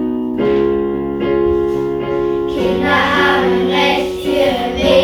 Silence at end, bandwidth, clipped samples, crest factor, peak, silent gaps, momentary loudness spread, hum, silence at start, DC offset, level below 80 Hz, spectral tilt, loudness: 0 s; 14.5 kHz; under 0.1%; 14 dB; 0 dBFS; none; 6 LU; none; 0 s; under 0.1%; -36 dBFS; -5.5 dB/octave; -15 LUFS